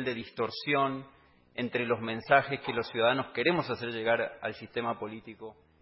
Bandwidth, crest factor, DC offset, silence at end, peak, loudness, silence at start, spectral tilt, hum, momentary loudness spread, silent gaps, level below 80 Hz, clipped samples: 5.8 kHz; 22 dB; under 0.1%; 0.3 s; -8 dBFS; -30 LUFS; 0 s; -9 dB/octave; none; 16 LU; none; -68 dBFS; under 0.1%